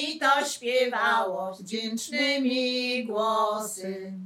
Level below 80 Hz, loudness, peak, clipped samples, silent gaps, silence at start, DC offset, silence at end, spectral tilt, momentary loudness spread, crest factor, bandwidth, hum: -80 dBFS; -26 LUFS; -10 dBFS; under 0.1%; none; 0 s; under 0.1%; 0 s; -2.5 dB/octave; 10 LU; 16 dB; 17 kHz; none